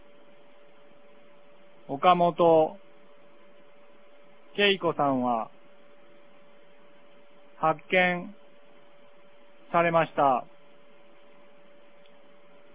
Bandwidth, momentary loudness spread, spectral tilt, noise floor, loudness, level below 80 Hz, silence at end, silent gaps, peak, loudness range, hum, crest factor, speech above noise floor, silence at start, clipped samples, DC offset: 4 kHz; 12 LU; -9 dB/octave; -57 dBFS; -25 LUFS; -72 dBFS; 2.3 s; none; -6 dBFS; 4 LU; none; 24 dB; 34 dB; 1.9 s; under 0.1%; 0.4%